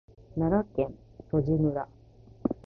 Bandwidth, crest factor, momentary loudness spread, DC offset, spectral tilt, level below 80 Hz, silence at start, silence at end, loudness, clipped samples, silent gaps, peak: 4.6 kHz; 18 dB; 10 LU; under 0.1%; -12 dB/octave; -48 dBFS; 0.3 s; 0.15 s; -30 LUFS; under 0.1%; none; -12 dBFS